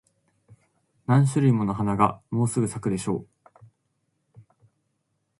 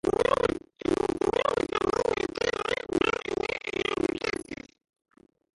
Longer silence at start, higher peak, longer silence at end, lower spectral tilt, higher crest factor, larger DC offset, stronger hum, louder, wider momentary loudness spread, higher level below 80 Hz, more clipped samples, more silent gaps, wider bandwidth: first, 1.1 s vs 0.05 s; first, -4 dBFS vs -10 dBFS; first, 2.15 s vs 1 s; first, -7.5 dB/octave vs -4.5 dB/octave; about the same, 22 dB vs 18 dB; neither; neither; first, -24 LUFS vs -28 LUFS; about the same, 9 LU vs 7 LU; about the same, -56 dBFS vs -52 dBFS; neither; neither; about the same, 11.5 kHz vs 11.5 kHz